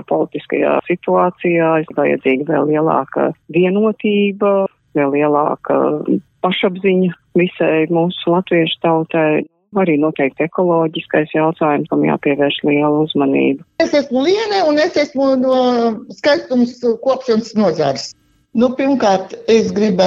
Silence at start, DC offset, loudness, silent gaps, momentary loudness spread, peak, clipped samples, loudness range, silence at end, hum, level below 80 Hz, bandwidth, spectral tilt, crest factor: 0.1 s; under 0.1%; -15 LUFS; none; 4 LU; -2 dBFS; under 0.1%; 1 LU; 0 s; none; -60 dBFS; 7.8 kHz; -6.5 dB/octave; 14 dB